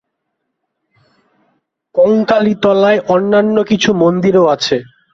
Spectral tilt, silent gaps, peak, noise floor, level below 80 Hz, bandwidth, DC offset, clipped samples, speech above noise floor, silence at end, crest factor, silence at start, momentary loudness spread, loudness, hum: -5.5 dB/octave; none; -2 dBFS; -72 dBFS; -54 dBFS; 7.6 kHz; under 0.1%; under 0.1%; 61 dB; 0.3 s; 12 dB; 1.95 s; 4 LU; -12 LUFS; none